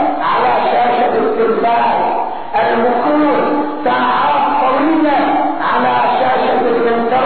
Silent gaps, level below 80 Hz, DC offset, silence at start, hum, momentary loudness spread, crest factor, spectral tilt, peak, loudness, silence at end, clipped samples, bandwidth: none; -52 dBFS; 3%; 0 s; none; 3 LU; 10 dB; -2.5 dB/octave; -2 dBFS; -13 LUFS; 0 s; under 0.1%; 4.5 kHz